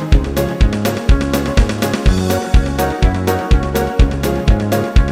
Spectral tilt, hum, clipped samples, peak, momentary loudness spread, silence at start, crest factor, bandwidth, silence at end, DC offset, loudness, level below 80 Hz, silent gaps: -6 dB/octave; none; under 0.1%; 0 dBFS; 2 LU; 0 s; 12 dB; 16.5 kHz; 0 s; 0.1%; -16 LUFS; -16 dBFS; none